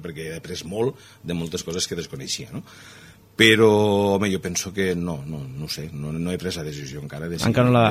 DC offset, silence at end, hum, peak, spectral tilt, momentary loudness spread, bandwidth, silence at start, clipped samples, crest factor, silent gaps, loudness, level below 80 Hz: under 0.1%; 0 s; none; -2 dBFS; -4.5 dB/octave; 17 LU; 16 kHz; 0 s; under 0.1%; 20 dB; none; -23 LUFS; -50 dBFS